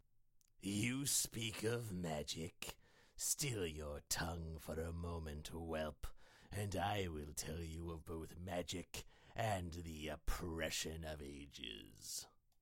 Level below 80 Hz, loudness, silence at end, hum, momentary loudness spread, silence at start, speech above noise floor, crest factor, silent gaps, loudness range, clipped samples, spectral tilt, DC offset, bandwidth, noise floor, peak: -56 dBFS; -44 LUFS; 0.3 s; none; 12 LU; 0.35 s; 27 dB; 22 dB; none; 4 LU; under 0.1%; -3.5 dB/octave; under 0.1%; 16.5 kHz; -72 dBFS; -24 dBFS